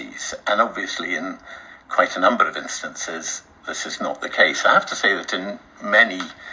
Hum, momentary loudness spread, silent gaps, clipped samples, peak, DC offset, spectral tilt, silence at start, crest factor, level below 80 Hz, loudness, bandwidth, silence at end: none; 15 LU; none; under 0.1%; -2 dBFS; under 0.1%; -1.5 dB/octave; 0 s; 20 dB; -62 dBFS; -20 LUFS; 7.8 kHz; 0 s